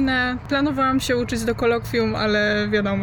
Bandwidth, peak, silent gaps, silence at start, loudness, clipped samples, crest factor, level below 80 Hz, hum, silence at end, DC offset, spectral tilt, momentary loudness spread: 18 kHz; -8 dBFS; none; 0 s; -21 LUFS; under 0.1%; 12 dB; -40 dBFS; none; 0 s; under 0.1%; -5 dB/octave; 3 LU